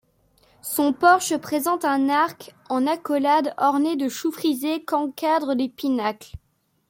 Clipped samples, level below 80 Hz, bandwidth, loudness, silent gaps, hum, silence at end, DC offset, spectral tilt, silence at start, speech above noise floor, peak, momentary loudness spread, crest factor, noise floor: under 0.1%; -58 dBFS; 17 kHz; -22 LUFS; none; none; 0.5 s; under 0.1%; -3.5 dB/octave; 0.65 s; 39 dB; -4 dBFS; 8 LU; 18 dB; -61 dBFS